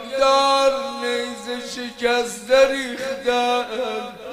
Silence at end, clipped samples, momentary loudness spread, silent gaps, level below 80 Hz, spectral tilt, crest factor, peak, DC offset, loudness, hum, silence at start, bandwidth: 0 s; under 0.1%; 12 LU; none; -54 dBFS; -2 dB/octave; 18 dB; -4 dBFS; under 0.1%; -20 LUFS; none; 0 s; 15.5 kHz